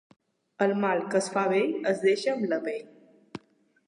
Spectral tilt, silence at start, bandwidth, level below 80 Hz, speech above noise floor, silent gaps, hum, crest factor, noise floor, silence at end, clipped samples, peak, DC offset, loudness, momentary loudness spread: -5 dB/octave; 0.6 s; 11 kHz; -78 dBFS; 37 dB; none; none; 18 dB; -64 dBFS; 0.5 s; under 0.1%; -12 dBFS; under 0.1%; -27 LUFS; 21 LU